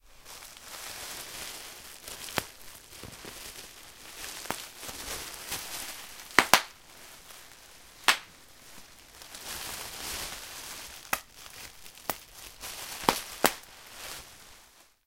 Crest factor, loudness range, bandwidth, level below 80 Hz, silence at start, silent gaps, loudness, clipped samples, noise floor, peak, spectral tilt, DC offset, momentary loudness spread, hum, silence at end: 36 dB; 10 LU; 17 kHz; -58 dBFS; 0.05 s; none; -32 LUFS; under 0.1%; -58 dBFS; 0 dBFS; -1 dB/octave; under 0.1%; 22 LU; none; 0.2 s